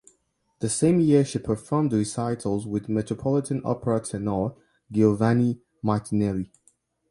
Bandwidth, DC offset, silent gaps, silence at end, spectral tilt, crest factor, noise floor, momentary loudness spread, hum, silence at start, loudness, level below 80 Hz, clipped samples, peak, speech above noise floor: 11.5 kHz; under 0.1%; none; 0.65 s; -7 dB/octave; 18 dB; -69 dBFS; 8 LU; none; 0.6 s; -25 LUFS; -54 dBFS; under 0.1%; -6 dBFS; 46 dB